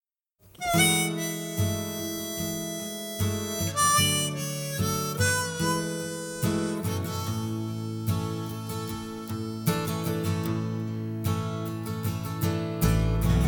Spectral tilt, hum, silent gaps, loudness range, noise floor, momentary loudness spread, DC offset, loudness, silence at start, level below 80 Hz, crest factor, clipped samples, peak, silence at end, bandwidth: -4 dB/octave; none; none; 5 LU; -62 dBFS; 11 LU; under 0.1%; -28 LUFS; 0.6 s; -40 dBFS; 20 dB; under 0.1%; -8 dBFS; 0 s; 19 kHz